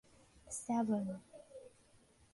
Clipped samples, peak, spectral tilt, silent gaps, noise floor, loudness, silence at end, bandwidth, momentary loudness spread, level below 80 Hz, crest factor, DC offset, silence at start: under 0.1%; -26 dBFS; -6 dB/octave; none; -68 dBFS; -39 LUFS; 0.65 s; 11.5 kHz; 22 LU; -72 dBFS; 16 dB; under 0.1%; 0.35 s